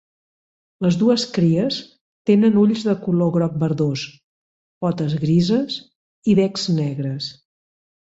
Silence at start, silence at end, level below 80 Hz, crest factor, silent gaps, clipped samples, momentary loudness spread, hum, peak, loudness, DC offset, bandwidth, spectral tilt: 0.8 s; 0.8 s; -58 dBFS; 16 dB; 2.01-2.25 s, 4.24-4.81 s, 5.96-6.22 s; under 0.1%; 11 LU; none; -4 dBFS; -20 LUFS; under 0.1%; 8 kHz; -7 dB/octave